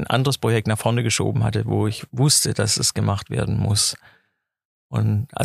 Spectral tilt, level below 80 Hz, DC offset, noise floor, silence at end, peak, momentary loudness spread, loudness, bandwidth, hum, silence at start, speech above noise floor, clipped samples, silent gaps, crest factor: -4 dB/octave; -48 dBFS; under 0.1%; -70 dBFS; 0 s; -4 dBFS; 7 LU; -20 LUFS; 15.5 kHz; none; 0 s; 49 dB; under 0.1%; 4.65-4.90 s; 18 dB